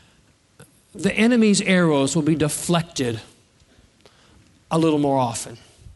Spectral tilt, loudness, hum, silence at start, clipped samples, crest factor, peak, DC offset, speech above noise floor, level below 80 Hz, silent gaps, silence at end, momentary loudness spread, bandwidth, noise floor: -5 dB/octave; -20 LUFS; none; 0.6 s; under 0.1%; 18 dB; -4 dBFS; under 0.1%; 38 dB; -54 dBFS; none; 0.05 s; 10 LU; 11.5 kHz; -58 dBFS